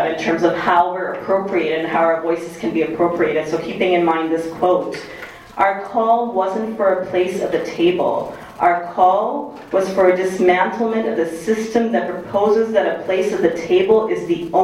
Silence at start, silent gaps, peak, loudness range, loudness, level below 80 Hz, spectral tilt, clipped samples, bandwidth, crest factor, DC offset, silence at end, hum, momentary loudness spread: 0 s; none; 0 dBFS; 2 LU; -18 LUFS; -54 dBFS; -5.5 dB/octave; under 0.1%; 13.5 kHz; 18 dB; under 0.1%; 0 s; none; 7 LU